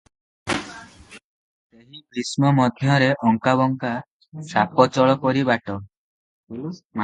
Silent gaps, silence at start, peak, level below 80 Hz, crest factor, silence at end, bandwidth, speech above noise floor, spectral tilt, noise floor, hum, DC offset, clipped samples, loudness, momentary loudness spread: 1.24-1.70 s, 4.08-4.20 s, 4.28-4.32 s, 5.97-6.47 s, 6.84-6.90 s; 0.45 s; 0 dBFS; -58 dBFS; 22 dB; 0 s; 11.5 kHz; 25 dB; -6 dB/octave; -45 dBFS; none; under 0.1%; under 0.1%; -20 LUFS; 19 LU